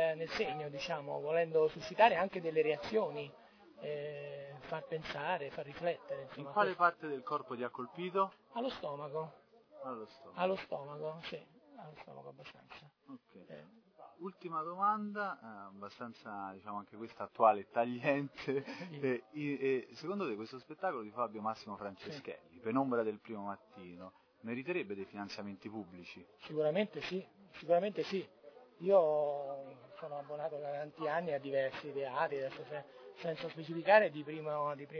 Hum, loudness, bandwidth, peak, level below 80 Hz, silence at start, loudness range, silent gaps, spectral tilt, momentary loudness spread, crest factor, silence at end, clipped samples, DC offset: none; -37 LUFS; 5.4 kHz; -12 dBFS; -78 dBFS; 0 s; 8 LU; none; -3.5 dB/octave; 20 LU; 26 dB; 0 s; under 0.1%; under 0.1%